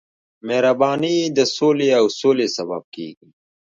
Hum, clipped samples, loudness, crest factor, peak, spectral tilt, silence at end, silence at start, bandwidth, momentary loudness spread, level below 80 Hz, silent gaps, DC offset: none; under 0.1%; -18 LUFS; 16 dB; -2 dBFS; -4.5 dB/octave; 0.65 s; 0.45 s; 7.6 kHz; 17 LU; -70 dBFS; 2.84-2.92 s; under 0.1%